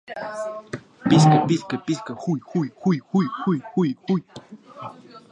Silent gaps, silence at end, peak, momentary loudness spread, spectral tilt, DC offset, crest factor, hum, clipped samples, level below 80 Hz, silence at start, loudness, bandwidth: none; 0.15 s; -2 dBFS; 22 LU; -7 dB/octave; under 0.1%; 20 dB; none; under 0.1%; -60 dBFS; 0.1 s; -22 LUFS; 10 kHz